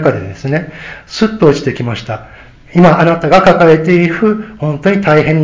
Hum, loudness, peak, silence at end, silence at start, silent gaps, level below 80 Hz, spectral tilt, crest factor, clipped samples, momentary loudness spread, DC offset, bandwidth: none; -11 LUFS; 0 dBFS; 0 s; 0 s; none; -40 dBFS; -7.5 dB/octave; 10 dB; 1%; 14 LU; under 0.1%; 8 kHz